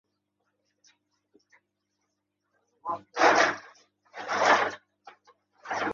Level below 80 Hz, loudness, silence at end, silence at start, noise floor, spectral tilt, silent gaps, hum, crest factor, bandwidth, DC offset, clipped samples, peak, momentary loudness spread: -74 dBFS; -25 LUFS; 0 s; 2.85 s; -80 dBFS; -2 dB/octave; none; 50 Hz at -65 dBFS; 24 dB; 7.6 kHz; under 0.1%; under 0.1%; -8 dBFS; 21 LU